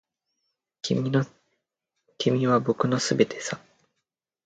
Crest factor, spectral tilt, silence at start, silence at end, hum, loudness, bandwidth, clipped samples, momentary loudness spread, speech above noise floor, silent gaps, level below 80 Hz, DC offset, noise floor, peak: 22 dB; -5.5 dB/octave; 0.85 s; 0.85 s; none; -25 LUFS; 9.2 kHz; under 0.1%; 13 LU; 59 dB; none; -66 dBFS; under 0.1%; -83 dBFS; -6 dBFS